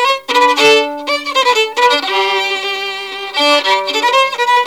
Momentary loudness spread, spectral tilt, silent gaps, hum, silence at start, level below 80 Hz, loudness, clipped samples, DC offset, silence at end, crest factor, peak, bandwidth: 9 LU; -0.5 dB/octave; none; none; 0 s; -64 dBFS; -12 LUFS; under 0.1%; 0.3%; 0 s; 12 dB; 0 dBFS; 17.5 kHz